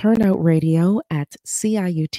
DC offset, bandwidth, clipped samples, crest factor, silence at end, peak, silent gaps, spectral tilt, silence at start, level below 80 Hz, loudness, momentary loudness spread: under 0.1%; 15.5 kHz; under 0.1%; 14 dB; 0 s; -4 dBFS; none; -6.5 dB/octave; 0 s; -54 dBFS; -19 LUFS; 9 LU